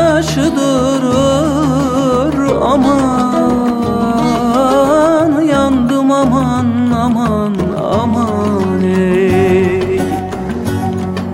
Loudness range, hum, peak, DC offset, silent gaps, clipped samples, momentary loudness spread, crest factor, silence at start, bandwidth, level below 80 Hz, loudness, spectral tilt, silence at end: 2 LU; none; 0 dBFS; under 0.1%; none; under 0.1%; 5 LU; 12 dB; 0 s; 16 kHz; -36 dBFS; -13 LUFS; -6.5 dB/octave; 0 s